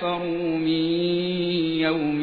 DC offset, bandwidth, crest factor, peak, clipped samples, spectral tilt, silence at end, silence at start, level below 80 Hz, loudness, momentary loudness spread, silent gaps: under 0.1%; 4.9 kHz; 12 dB; -12 dBFS; under 0.1%; -9 dB/octave; 0 s; 0 s; -56 dBFS; -24 LUFS; 3 LU; none